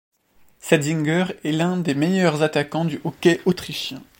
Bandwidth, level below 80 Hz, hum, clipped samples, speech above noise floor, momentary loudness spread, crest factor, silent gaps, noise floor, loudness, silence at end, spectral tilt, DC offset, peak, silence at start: 16.5 kHz; -60 dBFS; none; under 0.1%; 36 dB; 7 LU; 20 dB; none; -56 dBFS; -21 LUFS; 0.15 s; -5.5 dB/octave; under 0.1%; -2 dBFS; 0.65 s